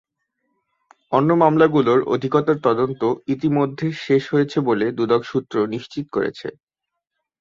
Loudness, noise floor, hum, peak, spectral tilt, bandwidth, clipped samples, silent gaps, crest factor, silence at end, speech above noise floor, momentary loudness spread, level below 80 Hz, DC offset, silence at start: -19 LUFS; -81 dBFS; none; -2 dBFS; -8 dB/octave; 7.4 kHz; under 0.1%; none; 18 dB; 0.9 s; 62 dB; 10 LU; -60 dBFS; under 0.1%; 1.1 s